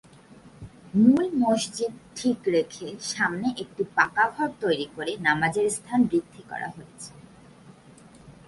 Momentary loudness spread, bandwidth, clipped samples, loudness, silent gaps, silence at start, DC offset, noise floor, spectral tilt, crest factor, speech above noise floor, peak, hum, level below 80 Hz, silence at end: 14 LU; 11.5 kHz; under 0.1%; -25 LUFS; none; 0.35 s; under 0.1%; -51 dBFS; -4.5 dB/octave; 20 dB; 26 dB; -6 dBFS; none; -62 dBFS; 0.15 s